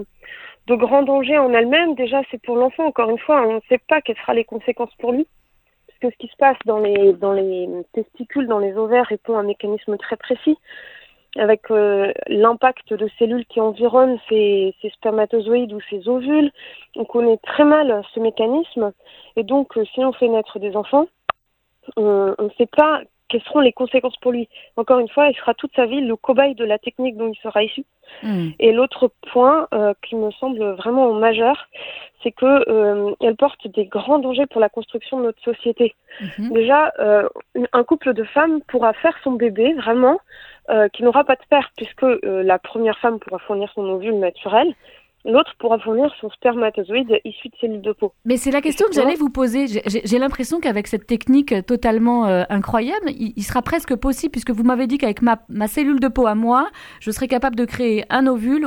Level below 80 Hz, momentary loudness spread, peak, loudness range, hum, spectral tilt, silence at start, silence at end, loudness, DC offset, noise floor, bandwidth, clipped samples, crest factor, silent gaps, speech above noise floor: -46 dBFS; 10 LU; 0 dBFS; 3 LU; none; -5.5 dB/octave; 0 s; 0 s; -18 LUFS; under 0.1%; -68 dBFS; 18.5 kHz; under 0.1%; 18 dB; none; 51 dB